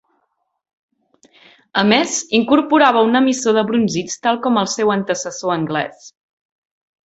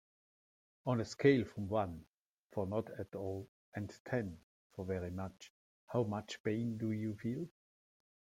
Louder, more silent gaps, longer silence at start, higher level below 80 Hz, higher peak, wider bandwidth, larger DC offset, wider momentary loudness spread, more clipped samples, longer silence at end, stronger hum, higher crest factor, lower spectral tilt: first, -16 LUFS vs -39 LUFS; second, none vs 2.09-2.49 s, 3.48-3.72 s, 4.00-4.05 s, 4.43-4.70 s, 5.50-5.87 s, 6.40-6.44 s; first, 1.75 s vs 0.85 s; first, -60 dBFS vs -72 dBFS; first, -2 dBFS vs -16 dBFS; second, 8.2 kHz vs 15.5 kHz; neither; second, 9 LU vs 16 LU; neither; about the same, 0.95 s vs 0.85 s; neither; second, 16 dB vs 24 dB; second, -4 dB/octave vs -7 dB/octave